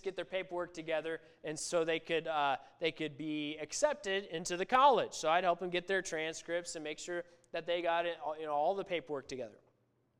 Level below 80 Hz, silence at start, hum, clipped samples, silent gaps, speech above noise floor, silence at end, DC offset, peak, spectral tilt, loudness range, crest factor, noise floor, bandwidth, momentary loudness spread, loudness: -72 dBFS; 0.05 s; none; under 0.1%; none; 40 dB; 0.65 s; under 0.1%; -14 dBFS; -3 dB/octave; 5 LU; 20 dB; -75 dBFS; 14.5 kHz; 11 LU; -35 LUFS